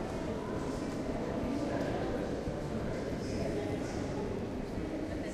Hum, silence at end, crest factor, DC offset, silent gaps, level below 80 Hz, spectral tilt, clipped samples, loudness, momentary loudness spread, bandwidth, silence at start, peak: none; 0 s; 14 dB; under 0.1%; none; -48 dBFS; -6.5 dB/octave; under 0.1%; -37 LUFS; 3 LU; 14 kHz; 0 s; -20 dBFS